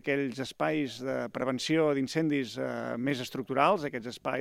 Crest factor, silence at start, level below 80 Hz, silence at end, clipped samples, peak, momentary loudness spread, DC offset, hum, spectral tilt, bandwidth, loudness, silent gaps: 22 dB; 0.05 s; -70 dBFS; 0 s; under 0.1%; -8 dBFS; 8 LU; under 0.1%; none; -5.5 dB/octave; 15.5 kHz; -31 LUFS; none